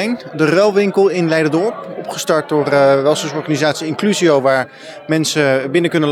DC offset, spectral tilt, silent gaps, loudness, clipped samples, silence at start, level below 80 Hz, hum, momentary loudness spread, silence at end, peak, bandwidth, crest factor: under 0.1%; -5 dB/octave; none; -15 LUFS; under 0.1%; 0 s; -72 dBFS; none; 9 LU; 0 s; -2 dBFS; 16 kHz; 12 dB